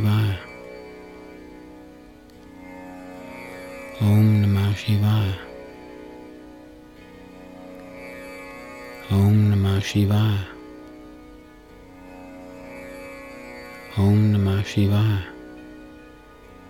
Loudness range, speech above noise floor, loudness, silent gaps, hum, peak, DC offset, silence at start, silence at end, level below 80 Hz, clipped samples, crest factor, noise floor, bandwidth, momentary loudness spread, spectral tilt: 17 LU; 28 dB; -21 LUFS; none; none; -8 dBFS; under 0.1%; 0 s; 0.8 s; -52 dBFS; under 0.1%; 16 dB; -46 dBFS; 15.5 kHz; 25 LU; -7.5 dB/octave